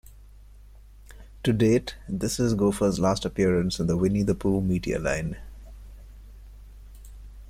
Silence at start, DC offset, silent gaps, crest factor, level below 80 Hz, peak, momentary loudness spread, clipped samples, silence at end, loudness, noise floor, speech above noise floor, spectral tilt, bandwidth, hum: 0.1 s; under 0.1%; none; 16 dB; -42 dBFS; -10 dBFS; 12 LU; under 0.1%; 0 s; -25 LUFS; -48 dBFS; 24 dB; -6 dB/octave; 15.5 kHz; none